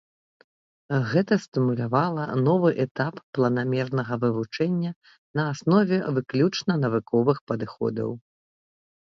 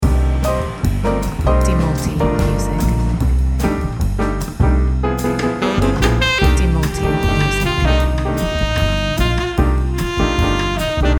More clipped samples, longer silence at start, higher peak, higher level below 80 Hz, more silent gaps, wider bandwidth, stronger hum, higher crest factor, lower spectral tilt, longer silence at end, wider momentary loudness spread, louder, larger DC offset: neither; first, 0.9 s vs 0 s; second, -8 dBFS vs 0 dBFS; second, -66 dBFS vs -18 dBFS; first, 1.48-1.52 s, 2.91-2.95 s, 3.23-3.33 s, 4.96-5.02 s, 5.18-5.34 s, 7.41-7.47 s vs none; second, 7.6 kHz vs 18.5 kHz; neither; about the same, 18 dB vs 14 dB; first, -7.5 dB/octave vs -6 dB/octave; first, 0.9 s vs 0 s; first, 7 LU vs 4 LU; second, -25 LUFS vs -17 LUFS; neither